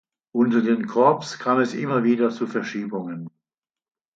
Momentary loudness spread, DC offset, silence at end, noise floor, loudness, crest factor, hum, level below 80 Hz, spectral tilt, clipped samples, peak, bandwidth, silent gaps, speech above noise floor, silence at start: 12 LU; under 0.1%; 0.9 s; -89 dBFS; -22 LUFS; 20 dB; none; -74 dBFS; -6.5 dB/octave; under 0.1%; -4 dBFS; 7.6 kHz; none; 68 dB; 0.35 s